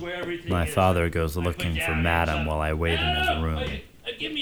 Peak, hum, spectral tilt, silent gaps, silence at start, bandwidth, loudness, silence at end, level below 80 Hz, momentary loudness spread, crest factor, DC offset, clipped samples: -6 dBFS; none; -5.5 dB/octave; none; 0 s; 19.5 kHz; -25 LUFS; 0 s; -34 dBFS; 9 LU; 20 dB; under 0.1%; under 0.1%